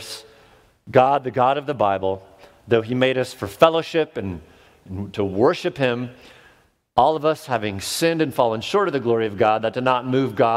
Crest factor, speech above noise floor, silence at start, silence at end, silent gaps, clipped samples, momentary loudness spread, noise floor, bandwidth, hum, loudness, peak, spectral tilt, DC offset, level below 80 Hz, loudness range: 22 dB; 36 dB; 0 s; 0 s; none; under 0.1%; 13 LU; -56 dBFS; 16 kHz; none; -21 LUFS; 0 dBFS; -5.5 dB/octave; under 0.1%; -56 dBFS; 3 LU